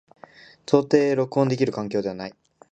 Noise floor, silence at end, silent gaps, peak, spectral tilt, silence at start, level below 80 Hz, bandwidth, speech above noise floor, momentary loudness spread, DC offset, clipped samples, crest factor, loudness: -49 dBFS; 0.4 s; none; -2 dBFS; -7 dB/octave; 0.7 s; -64 dBFS; 8.4 kHz; 27 dB; 17 LU; under 0.1%; under 0.1%; 20 dB; -22 LUFS